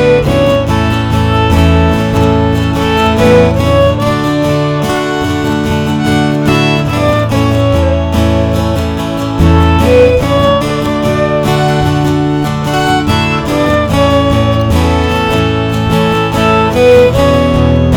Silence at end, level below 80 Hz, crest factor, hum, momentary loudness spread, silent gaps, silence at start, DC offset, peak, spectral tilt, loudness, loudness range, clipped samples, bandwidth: 0 s; -22 dBFS; 10 dB; none; 5 LU; none; 0 s; under 0.1%; 0 dBFS; -6.5 dB/octave; -10 LUFS; 2 LU; 0.8%; 18.5 kHz